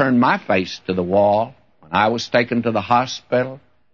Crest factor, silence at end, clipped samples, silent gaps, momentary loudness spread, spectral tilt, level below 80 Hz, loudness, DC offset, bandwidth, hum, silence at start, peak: 16 dB; 0.35 s; under 0.1%; none; 7 LU; -5.5 dB/octave; -58 dBFS; -19 LUFS; 0.1%; 7.2 kHz; none; 0 s; -2 dBFS